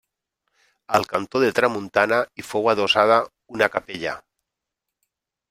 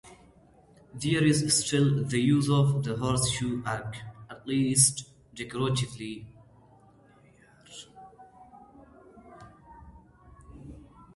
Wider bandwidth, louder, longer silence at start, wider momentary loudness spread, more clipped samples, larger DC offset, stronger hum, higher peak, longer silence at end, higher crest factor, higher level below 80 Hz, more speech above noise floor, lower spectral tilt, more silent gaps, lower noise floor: first, 16 kHz vs 11.5 kHz; first, -21 LUFS vs -26 LUFS; first, 0.9 s vs 0.05 s; second, 12 LU vs 25 LU; neither; neither; neither; first, -2 dBFS vs -8 dBFS; first, 1.3 s vs 0.35 s; about the same, 22 dB vs 22 dB; second, -62 dBFS vs -56 dBFS; first, 63 dB vs 32 dB; about the same, -4 dB/octave vs -4.5 dB/octave; neither; first, -84 dBFS vs -58 dBFS